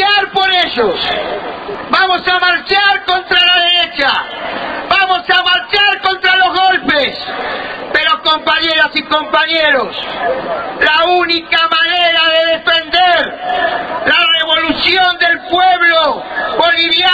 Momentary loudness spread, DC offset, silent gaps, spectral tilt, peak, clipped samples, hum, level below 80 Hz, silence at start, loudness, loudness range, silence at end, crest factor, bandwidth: 9 LU; under 0.1%; none; -3.5 dB/octave; 0 dBFS; under 0.1%; none; -46 dBFS; 0 s; -11 LUFS; 2 LU; 0 s; 12 dB; 8.4 kHz